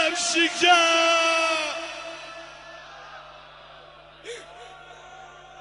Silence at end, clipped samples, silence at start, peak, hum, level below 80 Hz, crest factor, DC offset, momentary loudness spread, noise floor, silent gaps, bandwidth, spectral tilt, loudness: 0 s; under 0.1%; 0 s; -6 dBFS; 50 Hz at -60 dBFS; -64 dBFS; 18 dB; under 0.1%; 26 LU; -48 dBFS; none; 10.5 kHz; 0 dB/octave; -20 LUFS